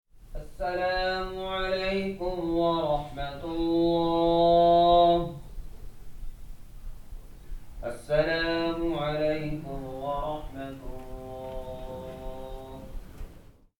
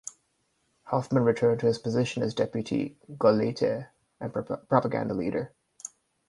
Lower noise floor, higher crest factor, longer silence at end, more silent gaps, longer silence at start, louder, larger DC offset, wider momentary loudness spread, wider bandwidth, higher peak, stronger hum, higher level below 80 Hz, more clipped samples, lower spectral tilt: second, -51 dBFS vs -73 dBFS; about the same, 18 dB vs 22 dB; about the same, 0.3 s vs 0.4 s; neither; about the same, 0.15 s vs 0.05 s; about the same, -27 LUFS vs -28 LUFS; neither; first, 26 LU vs 18 LU; first, 18.5 kHz vs 11.5 kHz; second, -10 dBFS vs -6 dBFS; neither; first, -42 dBFS vs -64 dBFS; neither; about the same, -6.5 dB/octave vs -6.5 dB/octave